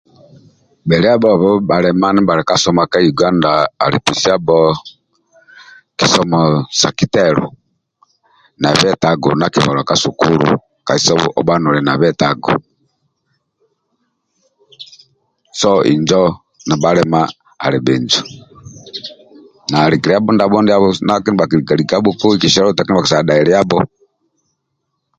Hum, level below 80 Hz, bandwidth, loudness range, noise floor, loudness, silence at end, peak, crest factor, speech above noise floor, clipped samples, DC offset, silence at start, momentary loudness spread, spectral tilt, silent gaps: none; -46 dBFS; 11 kHz; 5 LU; -71 dBFS; -13 LUFS; 1.35 s; 0 dBFS; 14 dB; 59 dB; under 0.1%; under 0.1%; 0.85 s; 7 LU; -5 dB/octave; none